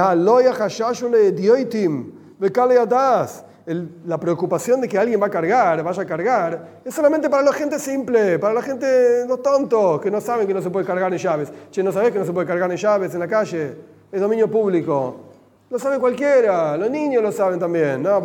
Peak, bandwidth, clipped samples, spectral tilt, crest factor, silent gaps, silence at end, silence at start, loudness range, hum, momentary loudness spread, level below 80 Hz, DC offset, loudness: -2 dBFS; 17 kHz; under 0.1%; -6 dB/octave; 16 dB; none; 0 s; 0 s; 3 LU; none; 10 LU; -72 dBFS; under 0.1%; -19 LUFS